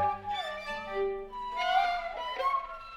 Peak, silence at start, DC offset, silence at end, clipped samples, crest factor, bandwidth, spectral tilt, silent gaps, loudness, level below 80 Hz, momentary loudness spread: -16 dBFS; 0 s; under 0.1%; 0 s; under 0.1%; 16 dB; 15.5 kHz; -3.5 dB/octave; none; -32 LUFS; -54 dBFS; 9 LU